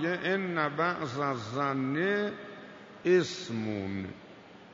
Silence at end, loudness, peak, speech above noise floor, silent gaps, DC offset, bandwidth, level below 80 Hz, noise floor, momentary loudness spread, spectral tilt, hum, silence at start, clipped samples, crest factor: 0 s; -31 LUFS; -14 dBFS; 21 dB; none; under 0.1%; 7.8 kHz; -74 dBFS; -51 dBFS; 20 LU; -6 dB/octave; none; 0 s; under 0.1%; 18 dB